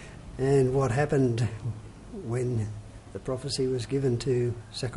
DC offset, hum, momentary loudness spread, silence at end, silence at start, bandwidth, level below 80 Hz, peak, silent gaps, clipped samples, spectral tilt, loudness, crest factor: under 0.1%; none; 17 LU; 0 s; 0 s; 11.5 kHz; -48 dBFS; -12 dBFS; none; under 0.1%; -6.5 dB/octave; -28 LUFS; 16 dB